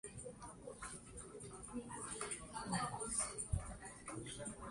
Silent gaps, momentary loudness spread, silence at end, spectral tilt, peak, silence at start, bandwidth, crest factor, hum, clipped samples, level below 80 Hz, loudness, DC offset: none; 12 LU; 0 s; -3.5 dB/octave; -26 dBFS; 0.05 s; 11.5 kHz; 22 dB; none; under 0.1%; -58 dBFS; -46 LUFS; under 0.1%